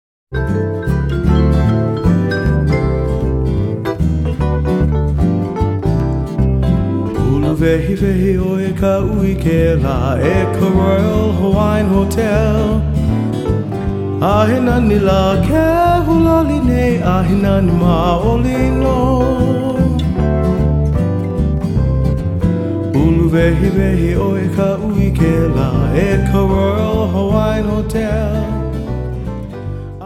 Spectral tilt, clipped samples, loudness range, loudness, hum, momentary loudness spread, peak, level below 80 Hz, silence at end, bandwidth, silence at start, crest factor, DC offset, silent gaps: -8.5 dB/octave; under 0.1%; 3 LU; -15 LUFS; none; 5 LU; 0 dBFS; -22 dBFS; 0 s; 15 kHz; 0.3 s; 12 dB; under 0.1%; none